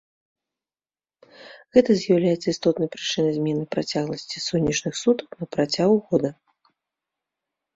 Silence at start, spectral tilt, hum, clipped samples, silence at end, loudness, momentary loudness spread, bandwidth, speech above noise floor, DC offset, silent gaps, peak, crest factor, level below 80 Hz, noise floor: 1.4 s; -5 dB/octave; none; under 0.1%; 1.45 s; -23 LUFS; 7 LU; 8 kHz; over 68 dB; under 0.1%; none; -4 dBFS; 20 dB; -58 dBFS; under -90 dBFS